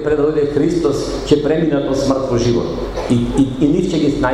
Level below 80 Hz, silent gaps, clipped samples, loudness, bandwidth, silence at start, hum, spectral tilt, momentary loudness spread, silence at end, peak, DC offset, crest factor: -32 dBFS; none; under 0.1%; -16 LUFS; 11.5 kHz; 0 s; none; -6.5 dB/octave; 3 LU; 0 s; 0 dBFS; under 0.1%; 16 dB